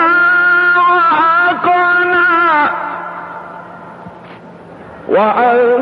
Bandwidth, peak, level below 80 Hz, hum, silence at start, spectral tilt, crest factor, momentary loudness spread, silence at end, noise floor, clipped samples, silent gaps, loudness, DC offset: 5.4 kHz; -2 dBFS; -58 dBFS; none; 0 s; -6.5 dB/octave; 12 dB; 21 LU; 0 s; -34 dBFS; under 0.1%; none; -10 LUFS; under 0.1%